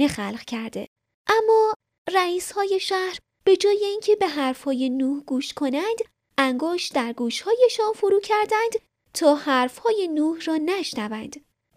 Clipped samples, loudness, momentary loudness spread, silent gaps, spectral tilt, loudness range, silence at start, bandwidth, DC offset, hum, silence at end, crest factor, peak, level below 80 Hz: under 0.1%; -23 LUFS; 12 LU; 0.87-0.96 s, 1.14-1.25 s, 1.76-1.80 s, 1.98-2.05 s; -3.5 dB/octave; 2 LU; 0 s; 15.5 kHz; under 0.1%; none; 0.4 s; 16 dB; -6 dBFS; -64 dBFS